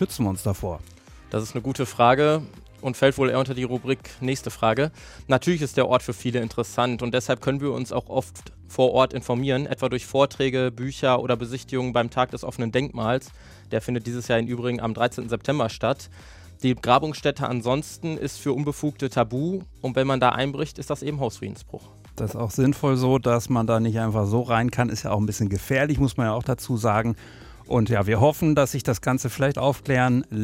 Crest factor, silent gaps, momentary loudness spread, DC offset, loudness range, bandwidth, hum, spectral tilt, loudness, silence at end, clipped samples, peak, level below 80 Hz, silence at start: 20 dB; none; 9 LU; under 0.1%; 3 LU; 16 kHz; none; -6 dB/octave; -24 LUFS; 0 s; under 0.1%; -4 dBFS; -48 dBFS; 0 s